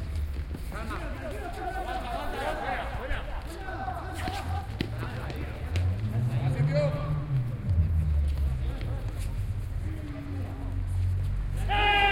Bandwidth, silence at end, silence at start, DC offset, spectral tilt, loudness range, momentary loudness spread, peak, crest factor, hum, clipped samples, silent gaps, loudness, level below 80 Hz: 16 kHz; 0 s; 0 s; under 0.1%; -6.5 dB/octave; 6 LU; 9 LU; -12 dBFS; 18 dB; none; under 0.1%; none; -31 LUFS; -34 dBFS